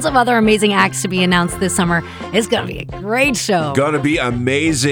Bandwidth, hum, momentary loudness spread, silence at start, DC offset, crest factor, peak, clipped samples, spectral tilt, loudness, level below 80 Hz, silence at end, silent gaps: over 20 kHz; none; 7 LU; 0 s; under 0.1%; 16 dB; 0 dBFS; under 0.1%; -4.5 dB/octave; -15 LUFS; -40 dBFS; 0 s; none